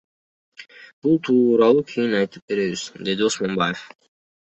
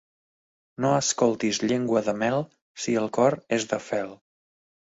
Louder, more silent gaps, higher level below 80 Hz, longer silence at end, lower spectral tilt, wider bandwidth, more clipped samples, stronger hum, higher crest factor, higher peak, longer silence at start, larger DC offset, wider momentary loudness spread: first, -20 LUFS vs -25 LUFS; about the same, 0.93-1.02 s, 2.42-2.48 s vs 2.61-2.75 s; about the same, -62 dBFS vs -66 dBFS; about the same, 0.65 s vs 0.7 s; about the same, -5 dB/octave vs -4.5 dB/octave; about the same, 8.4 kHz vs 8 kHz; neither; neither; about the same, 18 dB vs 18 dB; first, -4 dBFS vs -8 dBFS; second, 0.6 s vs 0.8 s; neither; first, 11 LU vs 8 LU